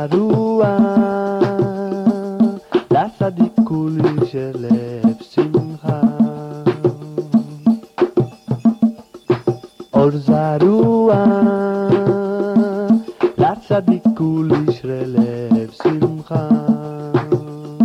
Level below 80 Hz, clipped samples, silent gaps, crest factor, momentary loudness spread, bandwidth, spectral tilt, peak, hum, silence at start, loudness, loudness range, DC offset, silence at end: -52 dBFS; under 0.1%; none; 14 dB; 7 LU; 6.4 kHz; -9.5 dB/octave; -2 dBFS; none; 0 s; -17 LUFS; 4 LU; under 0.1%; 0 s